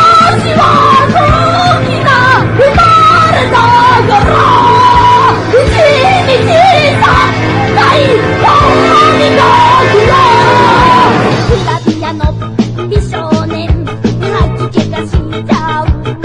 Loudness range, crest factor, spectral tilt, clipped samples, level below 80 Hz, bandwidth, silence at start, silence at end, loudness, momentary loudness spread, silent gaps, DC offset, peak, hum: 7 LU; 6 dB; -5.5 dB/octave; 0.6%; -22 dBFS; 11 kHz; 0 s; 0 s; -7 LUFS; 9 LU; none; under 0.1%; 0 dBFS; none